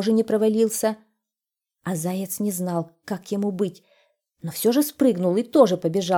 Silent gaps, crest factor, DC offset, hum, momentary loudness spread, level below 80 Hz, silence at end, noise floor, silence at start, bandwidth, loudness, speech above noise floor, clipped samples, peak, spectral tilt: none; 20 dB; under 0.1%; none; 14 LU; -70 dBFS; 0 s; -88 dBFS; 0 s; 19 kHz; -23 LUFS; 66 dB; under 0.1%; -4 dBFS; -5.5 dB/octave